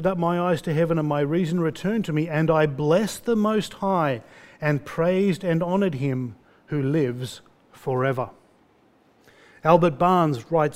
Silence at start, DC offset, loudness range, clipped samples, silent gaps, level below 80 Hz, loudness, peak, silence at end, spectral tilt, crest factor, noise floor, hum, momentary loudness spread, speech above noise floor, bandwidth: 0 s; under 0.1%; 5 LU; under 0.1%; none; -56 dBFS; -23 LUFS; -2 dBFS; 0 s; -7 dB/octave; 22 dB; -59 dBFS; none; 10 LU; 37 dB; 15.5 kHz